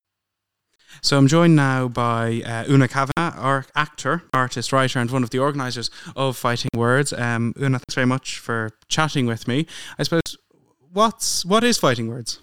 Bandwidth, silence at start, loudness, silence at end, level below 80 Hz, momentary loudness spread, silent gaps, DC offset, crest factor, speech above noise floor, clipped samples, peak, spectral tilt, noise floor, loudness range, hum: 17 kHz; 0 s; -21 LUFS; 0 s; -52 dBFS; 9 LU; none; 0.9%; 18 dB; 61 dB; under 0.1%; -2 dBFS; -5 dB/octave; -81 dBFS; 4 LU; none